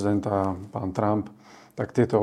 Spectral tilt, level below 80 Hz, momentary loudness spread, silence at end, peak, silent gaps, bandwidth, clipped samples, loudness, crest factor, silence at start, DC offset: -8.5 dB/octave; -60 dBFS; 12 LU; 0 s; -6 dBFS; none; 11 kHz; under 0.1%; -27 LUFS; 20 dB; 0 s; under 0.1%